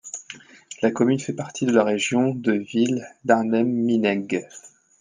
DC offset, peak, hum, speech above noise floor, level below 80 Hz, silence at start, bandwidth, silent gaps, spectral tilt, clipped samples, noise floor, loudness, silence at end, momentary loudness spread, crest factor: under 0.1%; -4 dBFS; none; 23 dB; -70 dBFS; 0.05 s; 9.8 kHz; none; -5.5 dB/octave; under 0.1%; -44 dBFS; -22 LUFS; 0.35 s; 16 LU; 20 dB